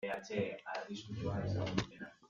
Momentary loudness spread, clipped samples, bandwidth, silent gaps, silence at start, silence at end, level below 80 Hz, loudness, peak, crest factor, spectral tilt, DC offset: 7 LU; under 0.1%; 7.6 kHz; none; 0 s; 0.05 s; -62 dBFS; -40 LUFS; -18 dBFS; 22 dB; -6 dB/octave; under 0.1%